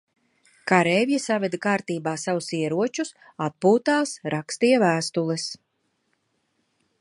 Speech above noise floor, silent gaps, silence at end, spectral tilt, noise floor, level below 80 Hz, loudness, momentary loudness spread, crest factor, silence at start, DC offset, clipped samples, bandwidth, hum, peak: 49 dB; none; 1.45 s; -5 dB/octave; -72 dBFS; -72 dBFS; -23 LUFS; 12 LU; 22 dB; 0.65 s; under 0.1%; under 0.1%; 11.5 kHz; none; -2 dBFS